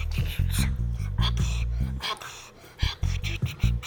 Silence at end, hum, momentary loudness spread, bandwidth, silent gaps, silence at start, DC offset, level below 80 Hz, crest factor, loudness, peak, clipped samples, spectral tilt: 0 s; none; 8 LU; 19.5 kHz; none; 0 s; under 0.1%; -30 dBFS; 18 dB; -29 LUFS; -10 dBFS; under 0.1%; -4.5 dB/octave